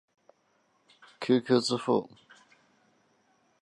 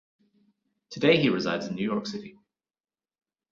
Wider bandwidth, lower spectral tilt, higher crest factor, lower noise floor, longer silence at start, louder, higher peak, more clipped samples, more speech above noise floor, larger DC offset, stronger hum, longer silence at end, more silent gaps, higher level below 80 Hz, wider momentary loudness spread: first, 11.5 kHz vs 7.6 kHz; about the same, -5 dB/octave vs -6 dB/octave; about the same, 22 dB vs 22 dB; second, -71 dBFS vs under -90 dBFS; first, 1.2 s vs 0.9 s; about the same, -28 LUFS vs -26 LUFS; about the same, -10 dBFS vs -8 dBFS; neither; second, 44 dB vs over 64 dB; neither; neither; first, 1.55 s vs 1.2 s; neither; second, -80 dBFS vs -68 dBFS; second, 13 LU vs 17 LU